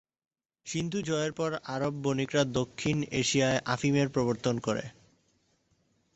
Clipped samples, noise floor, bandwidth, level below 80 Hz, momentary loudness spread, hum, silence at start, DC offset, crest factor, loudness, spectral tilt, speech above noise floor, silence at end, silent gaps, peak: under 0.1%; -72 dBFS; 8.2 kHz; -60 dBFS; 7 LU; none; 0.65 s; under 0.1%; 18 dB; -30 LUFS; -5 dB/octave; 42 dB; 1.25 s; none; -12 dBFS